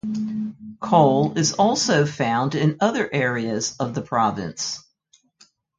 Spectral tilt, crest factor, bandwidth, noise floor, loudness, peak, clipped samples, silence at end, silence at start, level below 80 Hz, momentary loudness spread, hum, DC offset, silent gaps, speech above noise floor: -4.5 dB/octave; 20 dB; 9.4 kHz; -62 dBFS; -21 LUFS; -2 dBFS; under 0.1%; 1 s; 0.05 s; -60 dBFS; 11 LU; none; under 0.1%; none; 41 dB